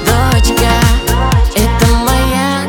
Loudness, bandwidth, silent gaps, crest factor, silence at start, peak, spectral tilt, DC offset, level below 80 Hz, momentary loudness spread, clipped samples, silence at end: -11 LUFS; 19.5 kHz; none; 10 dB; 0 s; 0 dBFS; -5 dB/octave; under 0.1%; -14 dBFS; 2 LU; under 0.1%; 0 s